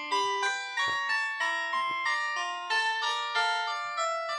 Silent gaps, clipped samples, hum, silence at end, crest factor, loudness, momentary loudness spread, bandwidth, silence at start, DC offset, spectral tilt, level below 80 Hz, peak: none; under 0.1%; none; 0 s; 14 dB; -29 LUFS; 3 LU; 12 kHz; 0 s; under 0.1%; 0.5 dB/octave; under -90 dBFS; -16 dBFS